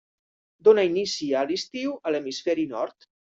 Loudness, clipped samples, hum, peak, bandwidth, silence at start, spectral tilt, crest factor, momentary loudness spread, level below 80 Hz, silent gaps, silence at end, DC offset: -25 LUFS; under 0.1%; none; -6 dBFS; 7.8 kHz; 0.65 s; -4 dB/octave; 20 dB; 11 LU; -70 dBFS; none; 0.4 s; under 0.1%